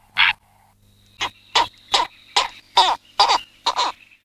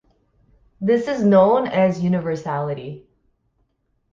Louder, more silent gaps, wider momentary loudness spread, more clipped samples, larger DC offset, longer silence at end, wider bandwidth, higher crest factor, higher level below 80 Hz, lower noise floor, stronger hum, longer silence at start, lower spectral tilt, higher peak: about the same, -20 LUFS vs -19 LUFS; neither; second, 10 LU vs 15 LU; neither; neither; second, 0.35 s vs 1.15 s; first, 15 kHz vs 7.4 kHz; about the same, 20 dB vs 16 dB; about the same, -56 dBFS vs -56 dBFS; second, -56 dBFS vs -68 dBFS; neither; second, 0.15 s vs 0.8 s; second, 0.5 dB/octave vs -8 dB/octave; about the same, -2 dBFS vs -4 dBFS